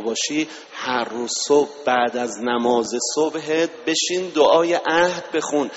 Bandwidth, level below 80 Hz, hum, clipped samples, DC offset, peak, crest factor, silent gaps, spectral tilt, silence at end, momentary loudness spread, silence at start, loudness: 8.2 kHz; -64 dBFS; none; under 0.1%; under 0.1%; -4 dBFS; 16 dB; none; -2.5 dB/octave; 0 s; 7 LU; 0 s; -20 LUFS